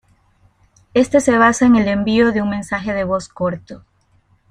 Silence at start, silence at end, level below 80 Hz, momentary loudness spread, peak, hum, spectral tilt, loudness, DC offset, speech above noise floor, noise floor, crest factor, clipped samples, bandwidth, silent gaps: 0.95 s; 0.75 s; -46 dBFS; 11 LU; -2 dBFS; none; -5.5 dB/octave; -16 LUFS; under 0.1%; 42 dB; -57 dBFS; 16 dB; under 0.1%; 11 kHz; none